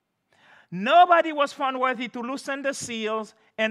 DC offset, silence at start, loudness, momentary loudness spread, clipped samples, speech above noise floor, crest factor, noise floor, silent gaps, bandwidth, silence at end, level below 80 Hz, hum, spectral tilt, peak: under 0.1%; 0.7 s; -23 LUFS; 15 LU; under 0.1%; 38 dB; 18 dB; -62 dBFS; none; 12.5 kHz; 0 s; -78 dBFS; none; -3.5 dB/octave; -6 dBFS